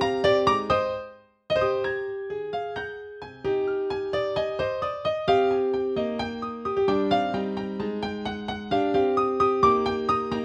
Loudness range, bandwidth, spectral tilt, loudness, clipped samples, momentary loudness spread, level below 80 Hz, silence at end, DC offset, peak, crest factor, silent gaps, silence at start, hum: 4 LU; 8.4 kHz; -6 dB/octave; -25 LUFS; under 0.1%; 11 LU; -52 dBFS; 0 s; under 0.1%; -8 dBFS; 18 dB; none; 0 s; none